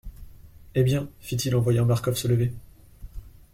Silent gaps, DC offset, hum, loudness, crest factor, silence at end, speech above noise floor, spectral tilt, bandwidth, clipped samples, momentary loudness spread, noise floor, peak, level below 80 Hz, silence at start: none; under 0.1%; none; -25 LUFS; 16 dB; 0.25 s; 23 dB; -6.5 dB/octave; 16 kHz; under 0.1%; 23 LU; -46 dBFS; -10 dBFS; -46 dBFS; 0.05 s